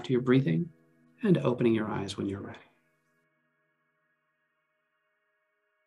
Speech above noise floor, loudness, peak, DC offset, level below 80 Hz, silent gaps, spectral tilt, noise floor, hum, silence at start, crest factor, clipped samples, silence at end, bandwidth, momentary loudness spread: 50 dB; -28 LUFS; -12 dBFS; under 0.1%; -72 dBFS; none; -7.5 dB/octave; -78 dBFS; none; 0 s; 20 dB; under 0.1%; 3.3 s; 11 kHz; 14 LU